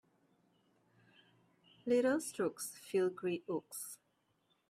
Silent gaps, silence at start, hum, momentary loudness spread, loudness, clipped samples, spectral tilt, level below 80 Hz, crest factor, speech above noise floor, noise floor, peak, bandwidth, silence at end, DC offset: none; 1.85 s; none; 14 LU; -37 LUFS; under 0.1%; -4.5 dB/octave; -86 dBFS; 18 dB; 42 dB; -79 dBFS; -22 dBFS; 16 kHz; 0.75 s; under 0.1%